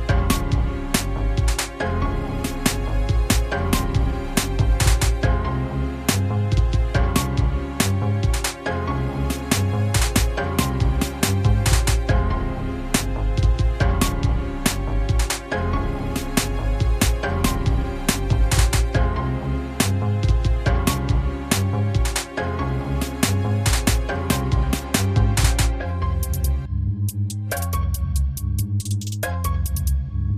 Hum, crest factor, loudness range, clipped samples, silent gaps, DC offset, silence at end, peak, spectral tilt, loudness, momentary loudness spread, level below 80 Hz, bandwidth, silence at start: none; 18 dB; 2 LU; under 0.1%; none; under 0.1%; 0 s; -2 dBFS; -5 dB/octave; -22 LUFS; 5 LU; -24 dBFS; 15 kHz; 0 s